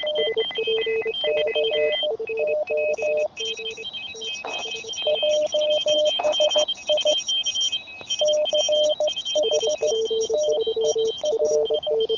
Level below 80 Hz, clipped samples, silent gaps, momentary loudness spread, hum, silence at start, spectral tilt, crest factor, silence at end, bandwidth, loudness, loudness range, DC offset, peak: -64 dBFS; under 0.1%; none; 8 LU; none; 0 s; 0 dB/octave; 14 dB; 0 s; 7.6 kHz; -22 LUFS; 4 LU; under 0.1%; -10 dBFS